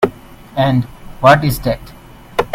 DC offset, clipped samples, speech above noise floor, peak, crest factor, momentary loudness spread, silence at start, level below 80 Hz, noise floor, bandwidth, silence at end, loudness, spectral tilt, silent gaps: under 0.1%; 0.1%; 22 dB; 0 dBFS; 16 dB; 15 LU; 0 s; -36 dBFS; -35 dBFS; 16.5 kHz; 0 s; -15 LUFS; -6.5 dB/octave; none